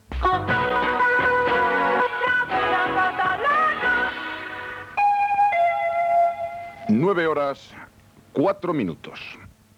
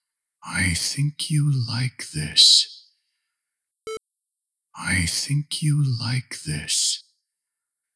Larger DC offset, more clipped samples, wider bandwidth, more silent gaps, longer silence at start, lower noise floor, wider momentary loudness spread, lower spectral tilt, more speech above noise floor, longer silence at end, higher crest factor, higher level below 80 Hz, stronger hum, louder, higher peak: neither; neither; first, 13.5 kHz vs 11 kHz; neither; second, 0.1 s vs 0.45 s; second, -51 dBFS vs -84 dBFS; second, 12 LU vs 16 LU; first, -6 dB/octave vs -2.5 dB/octave; second, 27 dB vs 62 dB; second, 0.3 s vs 0.95 s; second, 14 dB vs 20 dB; first, -44 dBFS vs -50 dBFS; neither; about the same, -21 LUFS vs -21 LUFS; second, -8 dBFS vs -4 dBFS